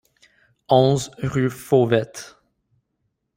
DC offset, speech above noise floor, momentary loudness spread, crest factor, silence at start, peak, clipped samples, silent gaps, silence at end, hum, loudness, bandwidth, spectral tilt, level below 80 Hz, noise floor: under 0.1%; 55 dB; 18 LU; 20 dB; 0.7 s; -2 dBFS; under 0.1%; none; 1.1 s; none; -20 LUFS; 16 kHz; -6 dB/octave; -56 dBFS; -74 dBFS